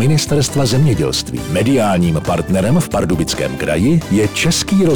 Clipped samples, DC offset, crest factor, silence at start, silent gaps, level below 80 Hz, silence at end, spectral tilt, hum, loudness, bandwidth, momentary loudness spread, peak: under 0.1%; under 0.1%; 8 dB; 0 s; none; -34 dBFS; 0 s; -5.5 dB/octave; none; -15 LUFS; 20 kHz; 4 LU; -6 dBFS